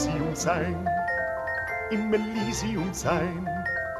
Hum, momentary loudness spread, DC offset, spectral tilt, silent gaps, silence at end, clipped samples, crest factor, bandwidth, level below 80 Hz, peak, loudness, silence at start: none; 3 LU; under 0.1%; -5 dB/octave; none; 0 s; under 0.1%; 18 dB; 14.5 kHz; -46 dBFS; -10 dBFS; -28 LUFS; 0 s